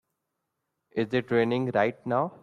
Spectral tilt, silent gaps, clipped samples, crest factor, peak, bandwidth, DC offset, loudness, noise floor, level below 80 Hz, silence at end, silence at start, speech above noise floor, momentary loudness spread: -8 dB/octave; none; under 0.1%; 18 dB; -10 dBFS; 9.8 kHz; under 0.1%; -27 LUFS; -82 dBFS; -70 dBFS; 0.05 s; 0.95 s; 56 dB; 6 LU